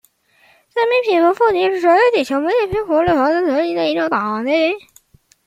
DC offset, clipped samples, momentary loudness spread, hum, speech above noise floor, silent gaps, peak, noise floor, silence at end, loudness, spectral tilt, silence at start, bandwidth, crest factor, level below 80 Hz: under 0.1%; under 0.1%; 6 LU; none; 39 dB; none; -2 dBFS; -54 dBFS; 0.7 s; -16 LUFS; -5.5 dB/octave; 0.75 s; 15 kHz; 14 dB; -50 dBFS